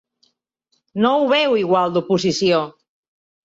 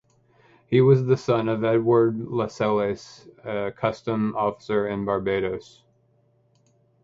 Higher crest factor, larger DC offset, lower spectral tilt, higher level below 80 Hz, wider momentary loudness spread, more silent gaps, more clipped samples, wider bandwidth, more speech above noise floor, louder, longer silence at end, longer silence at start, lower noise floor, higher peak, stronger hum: about the same, 16 dB vs 18 dB; neither; second, -5 dB/octave vs -8 dB/octave; about the same, -62 dBFS vs -58 dBFS; second, 5 LU vs 11 LU; neither; neither; about the same, 8 kHz vs 7.8 kHz; first, 52 dB vs 41 dB; first, -17 LUFS vs -23 LUFS; second, 0.75 s vs 1.4 s; first, 0.95 s vs 0.7 s; first, -69 dBFS vs -63 dBFS; about the same, -4 dBFS vs -6 dBFS; neither